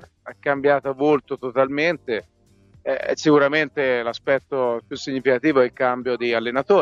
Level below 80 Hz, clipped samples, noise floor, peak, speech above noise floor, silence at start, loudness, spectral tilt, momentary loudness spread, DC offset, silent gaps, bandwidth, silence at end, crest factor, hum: -62 dBFS; under 0.1%; -54 dBFS; -4 dBFS; 34 dB; 0.25 s; -21 LUFS; -5.5 dB/octave; 10 LU; under 0.1%; none; 7.6 kHz; 0 s; 16 dB; none